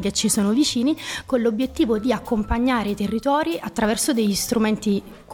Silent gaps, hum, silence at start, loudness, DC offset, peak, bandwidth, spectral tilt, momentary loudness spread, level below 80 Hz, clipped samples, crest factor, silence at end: none; none; 0 s; -21 LUFS; under 0.1%; -8 dBFS; 18.5 kHz; -4 dB/octave; 5 LU; -40 dBFS; under 0.1%; 14 dB; 0 s